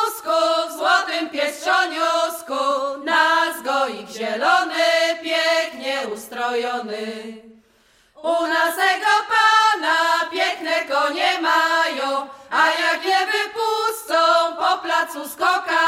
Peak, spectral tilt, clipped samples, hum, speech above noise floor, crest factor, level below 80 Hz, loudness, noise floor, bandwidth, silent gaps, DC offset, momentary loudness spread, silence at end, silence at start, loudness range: -4 dBFS; -1 dB/octave; under 0.1%; none; 37 dB; 16 dB; -70 dBFS; -19 LUFS; -57 dBFS; 16.5 kHz; none; under 0.1%; 9 LU; 0 s; 0 s; 5 LU